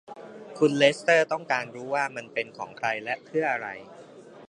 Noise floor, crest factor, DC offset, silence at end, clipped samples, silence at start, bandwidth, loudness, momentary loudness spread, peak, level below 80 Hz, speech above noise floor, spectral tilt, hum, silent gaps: -47 dBFS; 22 dB; under 0.1%; 0.05 s; under 0.1%; 0.1 s; 10.5 kHz; -26 LUFS; 18 LU; -6 dBFS; -78 dBFS; 21 dB; -4 dB/octave; none; none